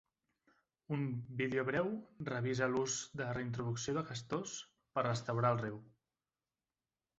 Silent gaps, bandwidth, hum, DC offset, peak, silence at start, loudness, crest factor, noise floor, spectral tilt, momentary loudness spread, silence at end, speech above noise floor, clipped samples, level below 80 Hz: none; 8 kHz; none; under 0.1%; -20 dBFS; 0.9 s; -38 LUFS; 20 dB; under -90 dBFS; -5.5 dB/octave; 8 LU; 1.3 s; over 52 dB; under 0.1%; -70 dBFS